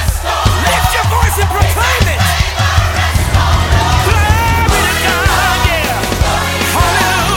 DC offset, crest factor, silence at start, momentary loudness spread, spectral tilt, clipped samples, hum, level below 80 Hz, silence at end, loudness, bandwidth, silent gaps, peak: under 0.1%; 12 dB; 0 s; 2 LU; -4 dB/octave; under 0.1%; none; -18 dBFS; 0 s; -12 LUFS; 18.5 kHz; none; 0 dBFS